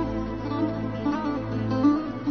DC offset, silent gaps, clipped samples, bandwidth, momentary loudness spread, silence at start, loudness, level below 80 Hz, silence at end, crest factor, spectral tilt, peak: 0.2%; none; under 0.1%; 6.4 kHz; 7 LU; 0 s; -26 LUFS; -44 dBFS; 0 s; 16 dB; -8.5 dB/octave; -10 dBFS